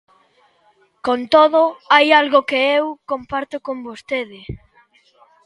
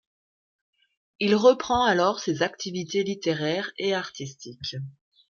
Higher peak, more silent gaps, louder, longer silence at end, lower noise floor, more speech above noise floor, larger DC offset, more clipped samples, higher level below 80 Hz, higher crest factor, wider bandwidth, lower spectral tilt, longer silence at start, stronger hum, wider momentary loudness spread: first, 0 dBFS vs -6 dBFS; neither; first, -16 LUFS vs -25 LUFS; first, 0.9 s vs 0.4 s; second, -58 dBFS vs under -90 dBFS; second, 41 dB vs over 65 dB; neither; neither; first, -52 dBFS vs -60 dBFS; about the same, 18 dB vs 20 dB; first, 11.5 kHz vs 7.2 kHz; about the same, -4.5 dB/octave vs -4.5 dB/octave; second, 1.05 s vs 1.2 s; neither; about the same, 18 LU vs 16 LU